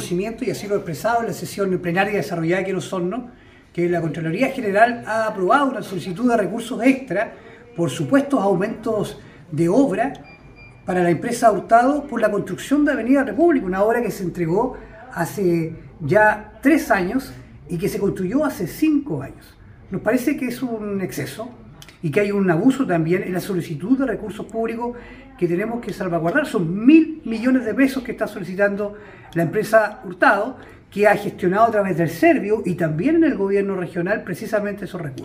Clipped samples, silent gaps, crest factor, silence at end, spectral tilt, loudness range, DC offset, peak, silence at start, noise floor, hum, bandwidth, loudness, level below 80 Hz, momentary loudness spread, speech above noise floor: under 0.1%; none; 20 dB; 0 s; -6.5 dB/octave; 5 LU; under 0.1%; 0 dBFS; 0 s; -44 dBFS; none; 15.5 kHz; -20 LUFS; -50 dBFS; 12 LU; 24 dB